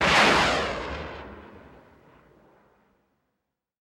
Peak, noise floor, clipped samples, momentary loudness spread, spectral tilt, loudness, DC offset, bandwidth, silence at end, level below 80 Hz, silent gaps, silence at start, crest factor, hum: -6 dBFS; -82 dBFS; under 0.1%; 25 LU; -3 dB/octave; -22 LUFS; under 0.1%; 16 kHz; 2.3 s; -46 dBFS; none; 0 s; 20 dB; none